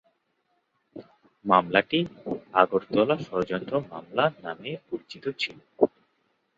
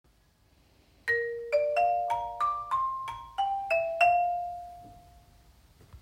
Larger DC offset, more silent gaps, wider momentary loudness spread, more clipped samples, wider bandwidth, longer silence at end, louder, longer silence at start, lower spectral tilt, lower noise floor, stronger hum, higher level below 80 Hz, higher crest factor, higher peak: neither; neither; about the same, 13 LU vs 13 LU; neither; second, 7.8 kHz vs 16 kHz; first, 0.7 s vs 0.05 s; first, -26 LUFS vs -29 LUFS; about the same, 0.95 s vs 1.05 s; first, -6.5 dB/octave vs -3 dB/octave; first, -73 dBFS vs -65 dBFS; neither; about the same, -64 dBFS vs -60 dBFS; first, 26 dB vs 20 dB; first, -2 dBFS vs -12 dBFS